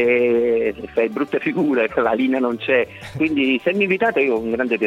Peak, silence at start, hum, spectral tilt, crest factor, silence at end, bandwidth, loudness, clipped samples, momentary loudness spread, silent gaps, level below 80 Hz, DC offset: -4 dBFS; 0 s; none; -7 dB/octave; 14 dB; 0 s; 10 kHz; -19 LUFS; under 0.1%; 5 LU; none; -54 dBFS; under 0.1%